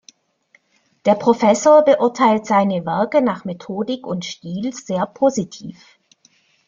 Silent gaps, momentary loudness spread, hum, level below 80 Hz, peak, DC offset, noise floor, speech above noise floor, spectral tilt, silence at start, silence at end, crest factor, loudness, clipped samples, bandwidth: none; 16 LU; none; -62 dBFS; -2 dBFS; under 0.1%; -61 dBFS; 43 dB; -5.5 dB/octave; 1.05 s; 0.95 s; 16 dB; -17 LUFS; under 0.1%; 7.4 kHz